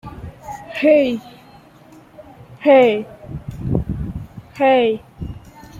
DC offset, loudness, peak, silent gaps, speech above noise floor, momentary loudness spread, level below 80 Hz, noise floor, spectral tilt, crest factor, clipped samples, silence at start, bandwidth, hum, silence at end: under 0.1%; -17 LUFS; -2 dBFS; none; 31 dB; 22 LU; -40 dBFS; -45 dBFS; -7.5 dB/octave; 18 dB; under 0.1%; 0.05 s; 14 kHz; none; 0 s